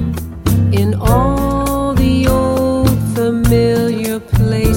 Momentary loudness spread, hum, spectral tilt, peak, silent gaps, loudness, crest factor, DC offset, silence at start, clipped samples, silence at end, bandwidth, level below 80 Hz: 4 LU; none; -7 dB/octave; 0 dBFS; none; -14 LUFS; 12 dB; under 0.1%; 0 s; under 0.1%; 0 s; 17 kHz; -22 dBFS